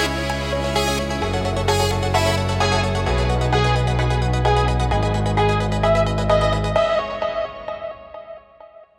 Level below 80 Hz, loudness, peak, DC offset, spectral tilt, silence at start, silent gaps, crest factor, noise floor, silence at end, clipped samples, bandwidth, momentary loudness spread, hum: -28 dBFS; -20 LUFS; -4 dBFS; under 0.1%; -5.5 dB/octave; 0 s; none; 16 dB; -45 dBFS; 0.15 s; under 0.1%; 17 kHz; 10 LU; none